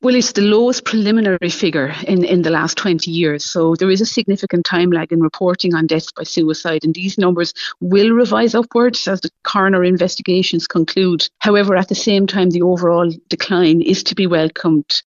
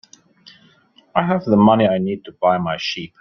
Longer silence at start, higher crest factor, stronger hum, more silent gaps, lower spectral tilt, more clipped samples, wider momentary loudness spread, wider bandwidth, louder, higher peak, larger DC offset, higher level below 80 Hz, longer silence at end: second, 0 s vs 1.15 s; about the same, 14 dB vs 18 dB; neither; neither; second, -5 dB/octave vs -7 dB/octave; neither; second, 5 LU vs 10 LU; first, 7.6 kHz vs 6.8 kHz; first, -15 LUFS vs -18 LUFS; about the same, 0 dBFS vs -2 dBFS; neither; about the same, -56 dBFS vs -56 dBFS; about the same, 0.05 s vs 0.15 s